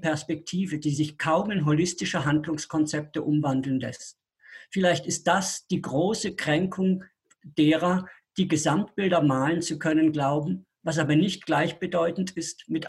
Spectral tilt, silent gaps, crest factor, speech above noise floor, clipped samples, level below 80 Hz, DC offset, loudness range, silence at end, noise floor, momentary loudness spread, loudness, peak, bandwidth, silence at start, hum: -5 dB/octave; none; 16 dB; 25 dB; under 0.1%; -62 dBFS; under 0.1%; 3 LU; 0 s; -50 dBFS; 8 LU; -26 LUFS; -10 dBFS; 12.5 kHz; 0 s; none